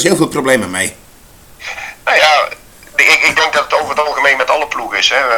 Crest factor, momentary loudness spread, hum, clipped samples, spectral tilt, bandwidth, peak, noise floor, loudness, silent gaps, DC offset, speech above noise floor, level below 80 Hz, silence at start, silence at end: 14 dB; 14 LU; none; 0.2%; -2.5 dB/octave; 19.5 kHz; 0 dBFS; -41 dBFS; -12 LUFS; none; under 0.1%; 28 dB; -48 dBFS; 0 s; 0 s